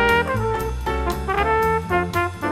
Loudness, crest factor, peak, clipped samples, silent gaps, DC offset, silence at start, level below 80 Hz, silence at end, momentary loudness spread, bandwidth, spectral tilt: -21 LUFS; 18 dB; -4 dBFS; under 0.1%; none; under 0.1%; 0 s; -32 dBFS; 0 s; 6 LU; 16 kHz; -5.5 dB/octave